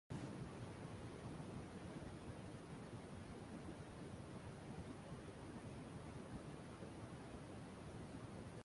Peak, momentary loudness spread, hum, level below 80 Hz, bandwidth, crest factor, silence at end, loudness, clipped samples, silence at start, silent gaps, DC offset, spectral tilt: -38 dBFS; 2 LU; none; -66 dBFS; 11.5 kHz; 14 dB; 0 s; -54 LUFS; under 0.1%; 0.1 s; none; under 0.1%; -6.5 dB/octave